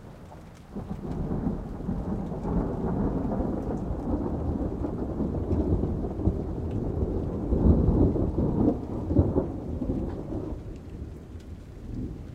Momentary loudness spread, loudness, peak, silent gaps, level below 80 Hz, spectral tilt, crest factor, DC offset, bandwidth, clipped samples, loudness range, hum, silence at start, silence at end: 16 LU; -29 LUFS; -8 dBFS; none; -34 dBFS; -10.5 dB/octave; 20 dB; under 0.1%; 7.6 kHz; under 0.1%; 5 LU; none; 0 s; 0 s